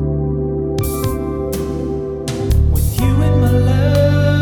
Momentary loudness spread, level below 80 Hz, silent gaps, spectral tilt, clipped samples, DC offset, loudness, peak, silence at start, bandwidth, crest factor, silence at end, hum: 8 LU; -22 dBFS; none; -7 dB/octave; under 0.1%; under 0.1%; -16 LUFS; -2 dBFS; 0 s; 19 kHz; 12 dB; 0 s; none